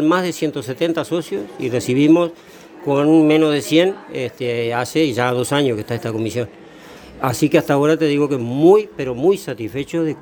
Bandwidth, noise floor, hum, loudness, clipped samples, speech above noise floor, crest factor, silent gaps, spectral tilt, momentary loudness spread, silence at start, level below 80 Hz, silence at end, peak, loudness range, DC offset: over 20 kHz; -40 dBFS; none; -18 LUFS; under 0.1%; 22 dB; 16 dB; none; -6 dB/octave; 11 LU; 0 s; -56 dBFS; 0 s; 0 dBFS; 4 LU; under 0.1%